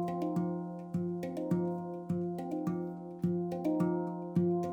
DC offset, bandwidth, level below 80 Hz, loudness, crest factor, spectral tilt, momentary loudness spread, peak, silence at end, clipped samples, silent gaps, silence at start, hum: under 0.1%; 8.4 kHz; -74 dBFS; -35 LUFS; 16 dB; -9.5 dB/octave; 7 LU; -18 dBFS; 0 s; under 0.1%; none; 0 s; none